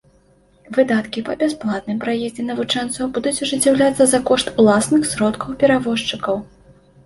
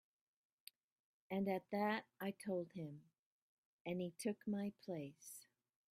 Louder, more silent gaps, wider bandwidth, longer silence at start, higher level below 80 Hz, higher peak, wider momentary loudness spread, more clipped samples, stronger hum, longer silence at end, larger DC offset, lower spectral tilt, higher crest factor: first, -18 LUFS vs -45 LUFS; second, none vs 3.19-3.85 s; second, 12 kHz vs 15.5 kHz; second, 0.7 s vs 1.3 s; first, -50 dBFS vs -88 dBFS; first, -2 dBFS vs -28 dBFS; second, 9 LU vs 20 LU; neither; neither; about the same, 0.6 s vs 0.5 s; neither; second, -4 dB/octave vs -6 dB/octave; about the same, 16 dB vs 20 dB